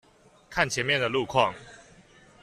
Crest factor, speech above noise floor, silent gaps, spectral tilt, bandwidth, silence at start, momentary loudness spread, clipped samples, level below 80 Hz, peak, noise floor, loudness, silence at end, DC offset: 24 dB; 29 dB; none; -3.5 dB/octave; 14 kHz; 0.5 s; 8 LU; under 0.1%; -58 dBFS; -6 dBFS; -55 dBFS; -26 LUFS; 0.6 s; under 0.1%